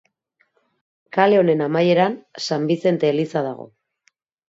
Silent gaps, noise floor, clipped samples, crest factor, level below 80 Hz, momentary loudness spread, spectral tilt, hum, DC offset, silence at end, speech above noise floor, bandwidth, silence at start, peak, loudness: none; -67 dBFS; under 0.1%; 20 dB; -70 dBFS; 11 LU; -6.5 dB/octave; none; under 0.1%; 0.85 s; 48 dB; 7.8 kHz; 1.15 s; 0 dBFS; -19 LUFS